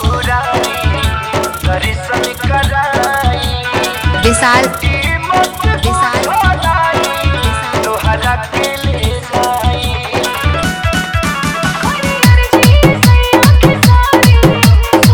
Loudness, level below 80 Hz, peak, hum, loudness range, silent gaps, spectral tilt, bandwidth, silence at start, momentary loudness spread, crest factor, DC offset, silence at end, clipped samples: -11 LUFS; -18 dBFS; 0 dBFS; none; 6 LU; none; -5 dB/octave; over 20 kHz; 0 s; 7 LU; 10 dB; 0.1%; 0 s; 0.4%